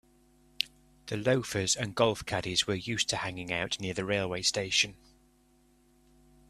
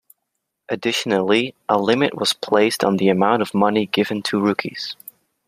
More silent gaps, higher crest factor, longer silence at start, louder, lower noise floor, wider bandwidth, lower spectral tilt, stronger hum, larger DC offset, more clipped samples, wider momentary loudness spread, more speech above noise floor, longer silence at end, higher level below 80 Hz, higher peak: neither; first, 28 dB vs 18 dB; about the same, 0.6 s vs 0.7 s; second, -30 LUFS vs -19 LUFS; second, -65 dBFS vs -77 dBFS; about the same, 14.5 kHz vs 15.5 kHz; second, -3 dB/octave vs -4.5 dB/octave; neither; neither; neither; about the same, 8 LU vs 9 LU; second, 34 dB vs 58 dB; first, 1.55 s vs 0.55 s; about the same, -60 dBFS vs -64 dBFS; about the same, -4 dBFS vs -2 dBFS